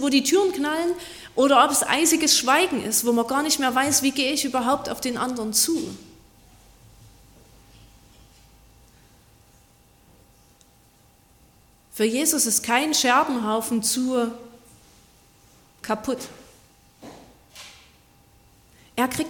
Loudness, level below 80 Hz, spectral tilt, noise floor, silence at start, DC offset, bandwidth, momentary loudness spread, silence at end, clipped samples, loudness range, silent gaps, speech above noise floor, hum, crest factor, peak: -21 LUFS; -58 dBFS; -1.5 dB/octave; -57 dBFS; 0 s; under 0.1%; 17.5 kHz; 17 LU; 0 s; under 0.1%; 16 LU; none; 35 dB; none; 20 dB; -4 dBFS